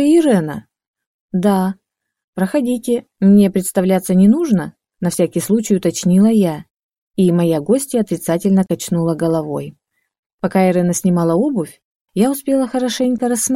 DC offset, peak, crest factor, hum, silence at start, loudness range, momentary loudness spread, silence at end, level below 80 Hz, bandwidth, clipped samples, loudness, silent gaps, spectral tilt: under 0.1%; -2 dBFS; 14 dB; none; 0 s; 3 LU; 12 LU; 0 s; -56 dBFS; 16 kHz; under 0.1%; -16 LUFS; 0.87-0.94 s, 1.07-1.29 s, 2.24-2.33 s, 6.71-6.92 s, 6.98-7.11 s, 10.19-10.38 s, 11.84-12.05 s; -6.5 dB/octave